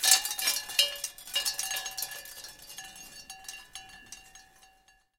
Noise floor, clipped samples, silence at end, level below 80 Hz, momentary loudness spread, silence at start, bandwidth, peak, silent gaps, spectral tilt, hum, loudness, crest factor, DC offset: -64 dBFS; under 0.1%; 0.75 s; -66 dBFS; 20 LU; 0 s; 17 kHz; -4 dBFS; none; 3 dB/octave; none; -28 LUFS; 28 dB; under 0.1%